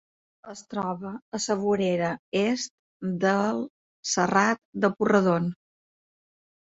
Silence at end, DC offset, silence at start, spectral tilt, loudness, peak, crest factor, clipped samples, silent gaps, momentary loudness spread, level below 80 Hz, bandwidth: 1.1 s; under 0.1%; 0.45 s; -5 dB/octave; -26 LUFS; -8 dBFS; 20 dB; under 0.1%; 1.22-1.32 s, 2.19-2.32 s, 2.70-3.00 s, 3.70-4.03 s, 4.65-4.73 s; 14 LU; -66 dBFS; 8.2 kHz